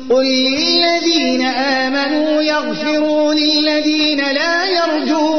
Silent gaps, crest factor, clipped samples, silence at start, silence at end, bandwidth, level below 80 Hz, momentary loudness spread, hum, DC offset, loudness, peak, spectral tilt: none; 10 dB; under 0.1%; 0 s; 0 s; 6.6 kHz; -54 dBFS; 3 LU; none; 1%; -14 LUFS; -4 dBFS; -2.5 dB/octave